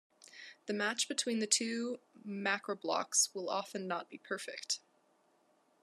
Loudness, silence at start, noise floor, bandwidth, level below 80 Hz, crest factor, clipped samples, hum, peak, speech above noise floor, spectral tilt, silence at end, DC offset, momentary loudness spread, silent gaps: -35 LUFS; 0.2 s; -72 dBFS; 13 kHz; under -90 dBFS; 24 dB; under 0.1%; none; -14 dBFS; 36 dB; -1.5 dB/octave; 1.05 s; under 0.1%; 13 LU; none